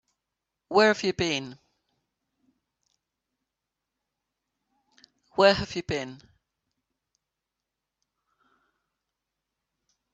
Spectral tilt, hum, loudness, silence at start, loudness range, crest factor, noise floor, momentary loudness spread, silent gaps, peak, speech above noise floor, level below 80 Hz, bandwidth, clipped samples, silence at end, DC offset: -4 dB/octave; none; -25 LUFS; 0.7 s; 11 LU; 26 dB; -86 dBFS; 14 LU; none; -6 dBFS; 62 dB; -60 dBFS; 8.2 kHz; under 0.1%; 4 s; under 0.1%